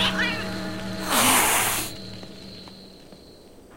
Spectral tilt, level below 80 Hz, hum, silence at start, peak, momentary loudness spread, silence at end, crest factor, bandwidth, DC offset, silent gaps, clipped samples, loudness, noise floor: -1.5 dB/octave; -48 dBFS; none; 0 s; -4 dBFS; 23 LU; 0 s; 22 dB; 16.5 kHz; 0.8%; none; under 0.1%; -22 LUFS; -47 dBFS